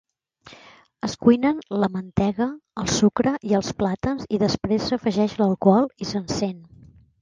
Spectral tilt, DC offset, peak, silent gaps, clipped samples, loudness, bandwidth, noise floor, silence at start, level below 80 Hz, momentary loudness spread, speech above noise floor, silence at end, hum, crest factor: -5.5 dB/octave; under 0.1%; -2 dBFS; none; under 0.1%; -22 LUFS; 9.6 kHz; -50 dBFS; 0.45 s; -48 dBFS; 9 LU; 29 dB; 0.6 s; none; 20 dB